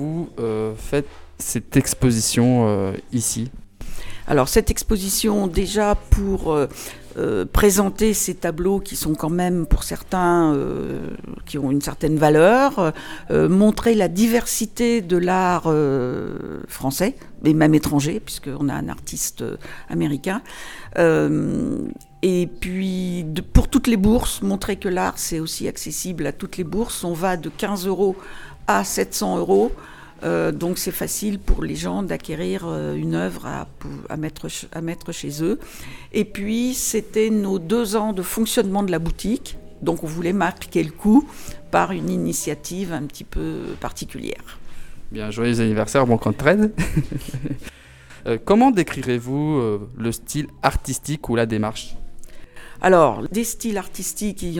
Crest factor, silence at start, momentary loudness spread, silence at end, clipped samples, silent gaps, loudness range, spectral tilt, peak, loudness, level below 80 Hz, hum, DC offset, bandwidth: 20 dB; 0 s; 13 LU; 0 s; under 0.1%; none; 7 LU; -5 dB/octave; 0 dBFS; -21 LUFS; -32 dBFS; none; under 0.1%; 19 kHz